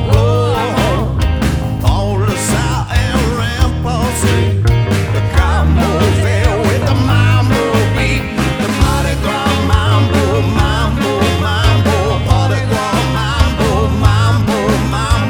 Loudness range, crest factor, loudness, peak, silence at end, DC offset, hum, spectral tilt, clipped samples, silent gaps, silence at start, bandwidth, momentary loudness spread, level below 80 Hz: 2 LU; 12 dB; -13 LUFS; 0 dBFS; 0 s; under 0.1%; none; -5.5 dB/octave; under 0.1%; none; 0 s; over 20 kHz; 4 LU; -20 dBFS